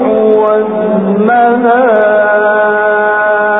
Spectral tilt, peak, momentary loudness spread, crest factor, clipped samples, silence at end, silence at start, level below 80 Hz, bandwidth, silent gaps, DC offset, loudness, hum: -10 dB/octave; 0 dBFS; 3 LU; 8 dB; under 0.1%; 0 s; 0 s; -56 dBFS; 4 kHz; none; 0.3%; -9 LUFS; none